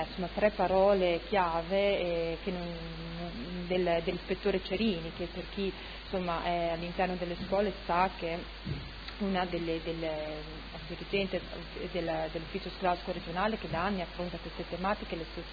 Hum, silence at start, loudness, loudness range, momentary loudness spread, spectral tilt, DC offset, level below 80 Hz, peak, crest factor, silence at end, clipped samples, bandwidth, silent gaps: none; 0 s; -33 LUFS; 5 LU; 11 LU; -7.5 dB/octave; under 0.1%; -48 dBFS; -14 dBFS; 20 dB; 0 s; under 0.1%; 5 kHz; none